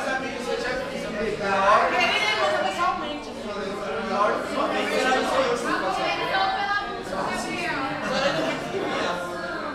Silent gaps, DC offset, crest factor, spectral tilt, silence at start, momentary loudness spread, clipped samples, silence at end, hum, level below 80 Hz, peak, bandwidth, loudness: none; under 0.1%; 20 dB; -3.5 dB/octave; 0 s; 10 LU; under 0.1%; 0 s; none; -52 dBFS; -6 dBFS; 15.5 kHz; -24 LUFS